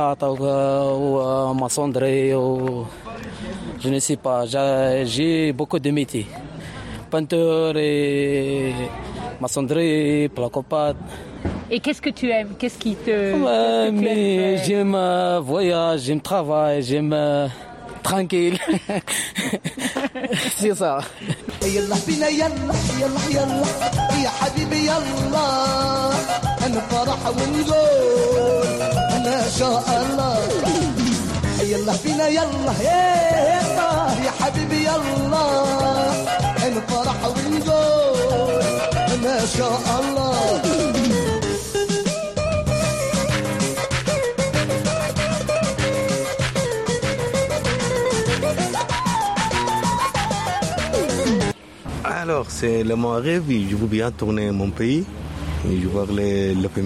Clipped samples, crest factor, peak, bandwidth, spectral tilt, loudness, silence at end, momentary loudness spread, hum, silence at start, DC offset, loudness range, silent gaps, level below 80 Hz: under 0.1%; 12 dB; -8 dBFS; 14 kHz; -5 dB/octave; -21 LUFS; 0 s; 7 LU; none; 0 s; under 0.1%; 3 LU; none; -40 dBFS